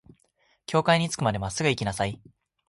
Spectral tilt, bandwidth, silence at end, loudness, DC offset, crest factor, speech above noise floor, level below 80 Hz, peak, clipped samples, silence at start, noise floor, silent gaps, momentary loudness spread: -4.5 dB/octave; 11.5 kHz; 0.55 s; -26 LUFS; under 0.1%; 20 dB; 42 dB; -52 dBFS; -8 dBFS; under 0.1%; 0.7 s; -68 dBFS; none; 12 LU